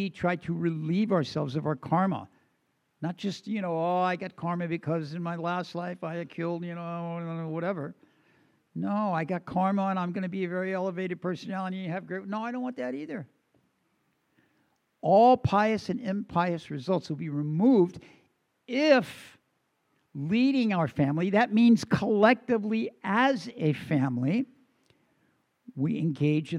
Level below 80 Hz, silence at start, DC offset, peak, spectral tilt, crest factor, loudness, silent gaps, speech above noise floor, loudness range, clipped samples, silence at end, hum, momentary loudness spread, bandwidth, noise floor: -68 dBFS; 0 s; under 0.1%; -8 dBFS; -7.5 dB/octave; 22 dB; -28 LUFS; none; 47 dB; 9 LU; under 0.1%; 0 s; none; 13 LU; 11 kHz; -74 dBFS